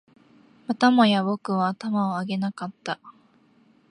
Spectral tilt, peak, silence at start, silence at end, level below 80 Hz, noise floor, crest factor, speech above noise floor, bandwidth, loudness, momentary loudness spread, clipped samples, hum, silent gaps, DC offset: -6 dB/octave; -6 dBFS; 0.7 s; 0.8 s; -74 dBFS; -59 dBFS; 18 dB; 36 dB; 10.5 kHz; -24 LUFS; 15 LU; under 0.1%; none; none; under 0.1%